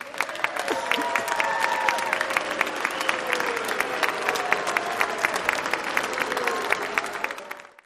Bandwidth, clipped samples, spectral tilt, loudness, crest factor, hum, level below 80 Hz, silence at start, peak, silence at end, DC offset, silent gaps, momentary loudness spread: 15.5 kHz; under 0.1%; -1.5 dB/octave; -25 LUFS; 22 dB; none; -66 dBFS; 0 s; -4 dBFS; 0.2 s; under 0.1%; none; 4 LU